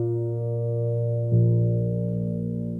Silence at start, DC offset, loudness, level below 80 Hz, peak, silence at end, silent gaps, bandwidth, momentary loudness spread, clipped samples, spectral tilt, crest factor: 0 s; under 0.1%; -25 LUFS; -50 dBFS; -12 dBFS; 0 s; none; 1.2 kHz; 7 LU; under 0.1%; -14 dB/octave; 12 dB